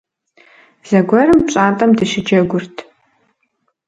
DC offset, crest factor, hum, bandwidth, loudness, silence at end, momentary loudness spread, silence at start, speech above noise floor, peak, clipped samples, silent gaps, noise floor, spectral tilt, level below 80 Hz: under 0.1%; 16 dB; none; 9.2 kHz; -13 LUFS; 1.05 s; 11 LU; 0.85 s; 54 dB; 0 dBFS; under 0.1%; none; -67 dBFS; -6 dB/octave; -48 dBFS